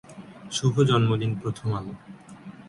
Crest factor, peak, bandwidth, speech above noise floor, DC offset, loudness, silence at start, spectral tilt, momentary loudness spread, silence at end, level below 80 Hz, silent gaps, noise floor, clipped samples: 18 dB; -8 dBFS; 11.5 kHz; 20 dB; under 0.1%; -25 LUFS; 0.1 s; -6 dB/octave; 24 LU; 0 s; -56 dBFS; none; -44 dBFS; under 0.1%